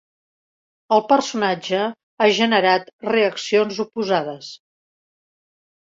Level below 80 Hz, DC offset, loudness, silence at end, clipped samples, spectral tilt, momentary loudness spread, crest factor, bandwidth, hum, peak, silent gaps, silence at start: -68 dBFS; under 0.1%; -19 LUFS; 1.3 s; under 0.1%; -4 dB/octave; 9 LU; 20 dB; 7.8 kHz; none; -2 dBFS; 2.03-2.17 s, 2.93-2.99 s; 0.9 s